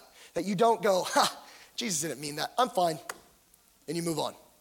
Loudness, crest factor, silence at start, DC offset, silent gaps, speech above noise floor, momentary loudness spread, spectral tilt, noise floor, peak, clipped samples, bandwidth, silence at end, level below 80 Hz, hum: -29 LUFS; 22 dB; 0.2 s; under 0.1%; none; 34 dB; 16 LU; -3.5 dB/octave; -63 dBFS; -10 dBFS; under 0.1%; 17.5 kHz; 0.25 s; -72 dBFS; none